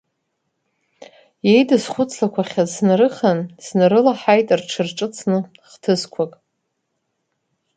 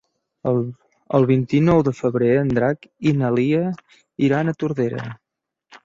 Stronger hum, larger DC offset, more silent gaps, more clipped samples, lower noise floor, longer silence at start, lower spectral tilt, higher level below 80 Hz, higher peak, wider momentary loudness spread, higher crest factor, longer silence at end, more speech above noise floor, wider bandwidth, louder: neither; neither; neither; neither; about the same, -74 dBFS vs -71 dBFS; first, 1.45 s vs 0.45 s; second, -5.5 dB/octave vs -8.5 dB/octave; second, -66 dBFS vs -52 dBFS; about the same, 0 dBFS vs -2 dBFS; about the same, 10 LU vs 12 LU; about the same, 18 dB vs 18 dB; first, 1.5 s vs 0.1 s; first, 56 dB vs 52 dB; first, 9.4 kHz vs 7.6 kHz; about the same, -18 LUFS vs -20 LUFS